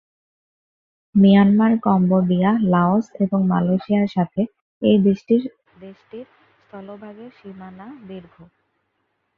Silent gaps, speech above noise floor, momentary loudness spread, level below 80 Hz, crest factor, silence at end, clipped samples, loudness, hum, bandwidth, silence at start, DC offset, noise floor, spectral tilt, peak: 4.61-4.81 s; 53 dB; 25 LU; -58 dBFS; 16 dB; 1.15 s; under 0.1%; -18 LUFS; none; 4.5 kHz; 1.15 s; under 0.1%; -71 dBFS; -9.5 dB/octave; -4 dBFS